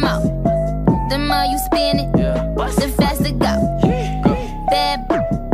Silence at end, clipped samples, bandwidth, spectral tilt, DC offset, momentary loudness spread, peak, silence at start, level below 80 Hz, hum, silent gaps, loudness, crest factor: 0 s; under 0.1%; 15.5 kHz; -6 dB/octave; under 0.1%; 3 LU; -2 dBFS; 0 s; -26 dBFS; none; none; -18 LUFS; 14 dB